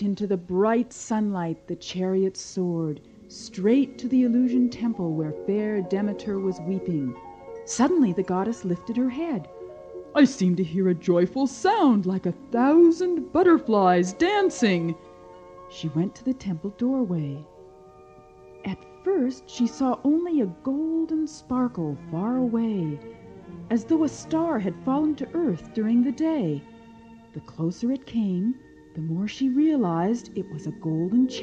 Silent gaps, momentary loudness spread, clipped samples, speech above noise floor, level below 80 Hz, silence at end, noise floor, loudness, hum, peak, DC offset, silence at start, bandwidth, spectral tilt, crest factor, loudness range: none; 14 LU; under 0.1%; 26 dB; -60 dBFS; 0 s; -50 dBFS; -25 LUFS; none; -6 dBFS; under 0.1%; 0 s; 9 kHz; -6.5 dB/octave; 18 dB; 8 LU